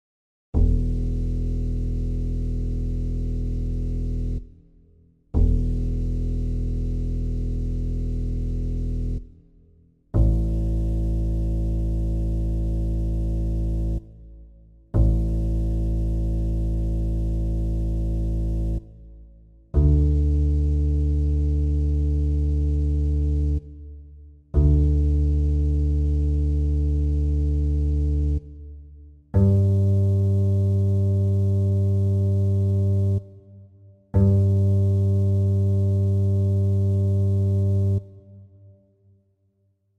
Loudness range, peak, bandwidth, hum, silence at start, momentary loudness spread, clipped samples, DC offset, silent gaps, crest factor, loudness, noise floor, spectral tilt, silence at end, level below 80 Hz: 7 LU; -6 dBFS; 1.5 kHz; none; 0.55 s; 8 LU; under 0.1%; under 0.1%; none; 16 dB; -24 LUFS; -67 dBFS; -11 dB/octave; 1.55 s; -26 dBFS